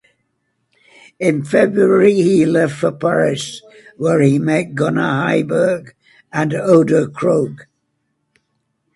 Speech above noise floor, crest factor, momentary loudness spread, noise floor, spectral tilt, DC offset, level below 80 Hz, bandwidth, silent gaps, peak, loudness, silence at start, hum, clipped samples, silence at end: 54 dB; 16 dB; 10 LU; -69 dBFS; -6.5 dB/octave; under 0.1%; -58 dBFS; 11.5 kHz; none; 0 dBFS; -15 LUFS; 1.2 s; none; under 0.1%; 1.35 s